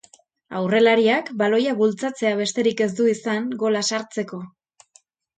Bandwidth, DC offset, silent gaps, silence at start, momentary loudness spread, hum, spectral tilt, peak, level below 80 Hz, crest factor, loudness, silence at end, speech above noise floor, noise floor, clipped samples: 9.4 kHz; under 0.1%; none; 0.5 s; 13 LU; none; -4 dB/octave; -4 dBFS; -70 dBFS; 18 dB; -21 LUFS; 0.9 s; 38 dB; -58 dBFS; under 0.1%